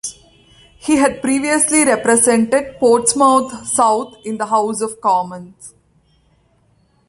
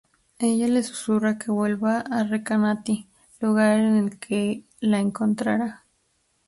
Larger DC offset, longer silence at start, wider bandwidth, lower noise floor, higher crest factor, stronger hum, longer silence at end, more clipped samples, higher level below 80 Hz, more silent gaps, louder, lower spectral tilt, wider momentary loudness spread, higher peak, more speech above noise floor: neither; second, 0.05 s vs 0.4 s; about the same, 11.5 kHz vs 11.5 kHz; second, -57 dBFS vs -69 dBFS; about the same, 16 dB vs 16 dB; neither; first, 1.4 s vs 0.7 s; neither; first, -54 dBFS vs -64 dBFS; neither; first, -15 LUFS vs -24 LUFS; second, -3 dB/octave vs -6 dB/octave; first, 12 LU vs 7 LU; first, 0 dBFS vs -8 dBFS; second, 42 dB vs 46 dB